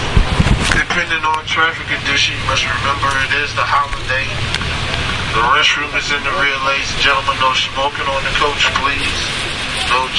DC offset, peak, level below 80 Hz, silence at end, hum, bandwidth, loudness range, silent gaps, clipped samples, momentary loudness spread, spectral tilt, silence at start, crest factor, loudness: under 0.1%; 0 dBFS; -26 dBFS; 0 s; none; 11.5 kHz; 1 LU; none; under 0.1%; 5 LU; -3 dB/octave; 0 s; 16 dB; -15 LUFS